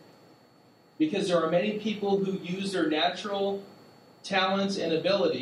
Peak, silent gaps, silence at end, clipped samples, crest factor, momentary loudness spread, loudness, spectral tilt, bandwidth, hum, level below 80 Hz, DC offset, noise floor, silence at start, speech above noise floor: -12 dBFS; none; 0 s; under 0.1%; 18 dB; 6 LU; -28 LUFS; -5 dB/octave; 12 kHz; none; -76 dBFS; under 0.1%; -59 dBFS; 1 s; 31 dB